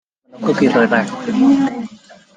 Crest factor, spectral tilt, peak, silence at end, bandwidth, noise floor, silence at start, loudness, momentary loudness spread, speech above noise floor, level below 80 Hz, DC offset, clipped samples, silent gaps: 14 dB; -6.5 dB/octave; -2 dBFS; 0.4 s; 9.2 kHz; -41 dBFS; 0.35 s; -15 LUFS; 12 LU; 27 dB; -58 dBFS; under 0.1%; under 0.1%; none